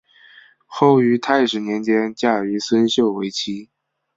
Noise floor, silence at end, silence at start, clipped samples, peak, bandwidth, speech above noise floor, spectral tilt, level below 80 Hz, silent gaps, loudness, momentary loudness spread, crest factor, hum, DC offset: -49 dBFS; 0.5 s; 0.7 s; under 0.1%; -2 dBFS; 7.8 kHz; 31 dB; -5 dB/octave; -62 dBFS; none; -18 LUFS; 10 LU; 18 dB; none; under 0.1%